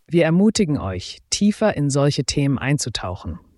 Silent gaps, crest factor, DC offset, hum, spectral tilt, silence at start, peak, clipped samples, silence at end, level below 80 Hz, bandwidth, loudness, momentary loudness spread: none; 16 dB; under 0.1%; none; -5.5 dB/octave; 0.1 s; -4 dBFS; under 0.1%; 0.2 s; -44 dBFS; 12 kHz; -20 LUFS; 12 LU